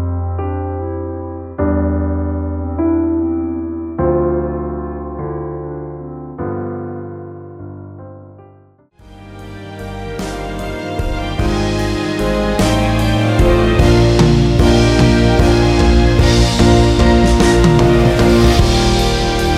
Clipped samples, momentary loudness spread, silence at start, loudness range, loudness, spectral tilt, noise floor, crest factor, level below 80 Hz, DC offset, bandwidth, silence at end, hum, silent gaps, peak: under 0.1%; 17 LU; 0 s; 17 LU; -14 LUFS; -6 dB/octave; -47 dBFS; 14 dB; -20 dBFS; under 0.1%; 14.5 kHz; 0 s; none; none; 0 dBFS